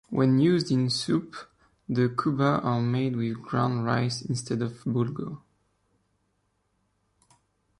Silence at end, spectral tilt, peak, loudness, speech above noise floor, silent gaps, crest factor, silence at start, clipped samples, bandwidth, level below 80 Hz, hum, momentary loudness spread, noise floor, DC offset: 2.45 s; -6.5 dB/octave; -10 dBFS; -26 LUFS; 48 dB; none; 16 dB; 0.1 s; under 0.1%; 11.5 kHz; -62 dBFS; none; 9 LU; -73 dBFS; under 0.1%